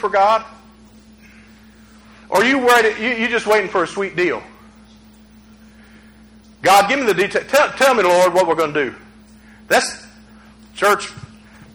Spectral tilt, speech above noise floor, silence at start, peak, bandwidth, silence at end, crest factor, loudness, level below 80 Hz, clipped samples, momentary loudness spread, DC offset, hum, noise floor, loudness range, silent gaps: -3 dB/octave; 30 dB; 0 s; -2 dBFS; over 20 kHz; 0.55 s; 18 dB; -16 LUFS; -52 dBFS; under 0.1%; 9 LU; under 0.1%; none; -46 dBFS; 6 LU; none